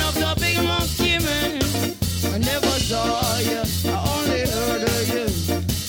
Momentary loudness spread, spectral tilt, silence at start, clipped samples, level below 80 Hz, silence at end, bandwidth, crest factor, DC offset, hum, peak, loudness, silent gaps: 3 LU; -4 dB/octave; 0 s; under 0.1%; -34 dBFS; 0 s; 17 kHz; 16 dB; under 0.1%; none; -6 dBFS; -21 LUFS; none